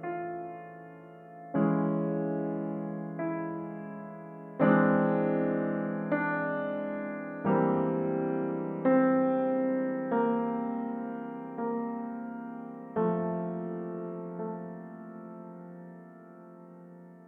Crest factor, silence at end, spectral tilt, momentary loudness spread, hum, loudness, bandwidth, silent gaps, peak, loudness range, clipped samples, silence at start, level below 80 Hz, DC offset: 20 dB; 0 s; -11.5 dB/octave; 21 LU; none; -31 LUFS; 3.8 kHz; none; -12 dBFS; 7 LU; under 0.1%; 0 s; -74 dBFS; under 0.1%